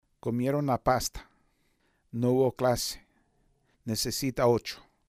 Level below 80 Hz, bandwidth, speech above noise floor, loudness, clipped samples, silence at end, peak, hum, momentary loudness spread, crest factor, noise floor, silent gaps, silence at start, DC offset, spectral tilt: -52 dBFS; 15.5 kHz; 43 dB; -28 LUFS; under 0.1%; 0.3 s; -10 dBFS; none; 13 LU; 20 dB; -71 dBFS; none; 0.25 s; under 0.1%; -5 dB/octave